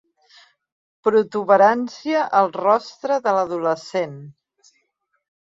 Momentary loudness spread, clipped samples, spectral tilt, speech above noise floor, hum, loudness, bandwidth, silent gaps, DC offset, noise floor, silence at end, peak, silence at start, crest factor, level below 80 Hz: 11 LU; under 0.1%; -5.5 dB/octave; 52 dB; none; -19 LUFS; 7.8 kHz; none; under 0.1%; -71 dBFS; 1.15 s; -2 dBFS; 1.05 s; 18 dB; -72 dBFS